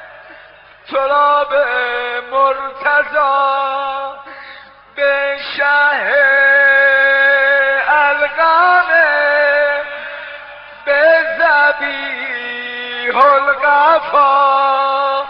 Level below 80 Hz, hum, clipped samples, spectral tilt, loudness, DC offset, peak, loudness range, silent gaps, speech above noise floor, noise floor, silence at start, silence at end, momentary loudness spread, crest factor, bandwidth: -58 dBFS; 50 Hz at -60 dBFS; under 0.1%; -4.5 dB/octave; -12 LUFS; under 0.1%; 0 dBFS; 6 LU; none; 28 dB; -41 dBFS; 0 s; 0 s; 13 LU; 14 dB; 5.6 kHz